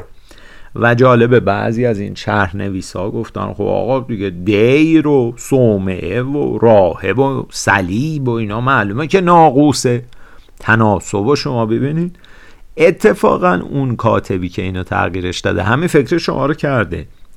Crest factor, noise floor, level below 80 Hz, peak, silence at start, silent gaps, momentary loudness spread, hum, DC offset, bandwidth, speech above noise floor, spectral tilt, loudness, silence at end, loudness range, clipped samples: 14 dB; -37 dBFS; -40 dBFS; 0 dBFS; 0 s; none; 11 LU; none; under 0.1%; 14 kHz; 23 dB; -6.5 dB/octave; -14 LUFS; 0 s; 3 LU; under 0.1%